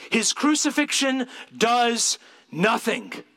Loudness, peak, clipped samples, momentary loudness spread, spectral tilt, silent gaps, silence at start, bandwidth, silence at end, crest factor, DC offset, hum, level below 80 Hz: -22 LUFS; -6 dBFS; under 0.1%; 10 LU; -2 dB/octave; none; 0 s; 16.5 kHz; 0.15 s; 18 dB; under 0.1%; none; -80 dBFS